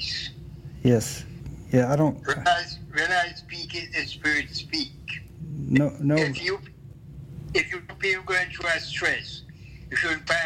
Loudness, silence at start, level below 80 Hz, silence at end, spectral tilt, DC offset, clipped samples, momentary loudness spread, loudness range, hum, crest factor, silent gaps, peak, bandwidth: -25 LUFS; 0 s; -48 dBFS; 0 s; -5 dB/octave; under 0.1%; under 0.1%; 18 LU; 3 LU; none; 18 dB; none; -8 dBFS; 16 kHz